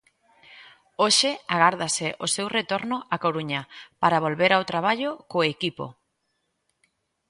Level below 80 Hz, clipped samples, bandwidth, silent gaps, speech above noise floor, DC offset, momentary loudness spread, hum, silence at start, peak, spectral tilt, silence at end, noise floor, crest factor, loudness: -68 dBFS; under 0.1%; 11.5 kHz; none; 51 dB; under 0.1%; 10 LU; none; 0.5 s; -4 dBFS; -3 dB/octave; 1.4 s; -75 dBFS; 22 dB; -23 LUFS